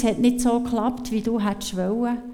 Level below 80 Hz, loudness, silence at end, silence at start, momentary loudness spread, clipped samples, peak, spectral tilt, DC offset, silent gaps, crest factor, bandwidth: -44 dBFS; -23 LUFS; 0 s; 0 s; 6 LU; under 0.1%; -8 dBFS; -5.5 dB/octave; under 0.1%; none; 14 dB; 15.5 kHz